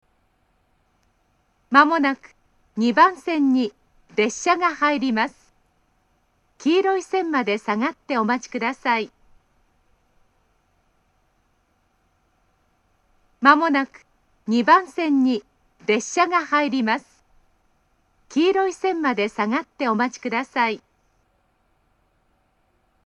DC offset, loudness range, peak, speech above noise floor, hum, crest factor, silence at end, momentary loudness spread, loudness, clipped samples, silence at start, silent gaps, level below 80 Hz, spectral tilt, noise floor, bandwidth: under 0.1%; 6 LU; 0 dBFS; 46 dB; none; 24 dB; 2.3 s; 10 LU; -21 LUFS; under 0.1%; 1.7 s; none; -66 dBFS; -4 dB/octave; -66 dBFS; 10.5 kHz